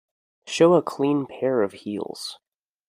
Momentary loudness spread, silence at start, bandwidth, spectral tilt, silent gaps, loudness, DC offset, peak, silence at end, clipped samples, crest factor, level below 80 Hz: 15 LU; 0.45 s; 14.5 kHz; -5.5 dB/octave; none; -23 LUFS; under 0.1%; -4 dBFS; 0.55 s; under 0.1%; 20 dB; -70 dBFS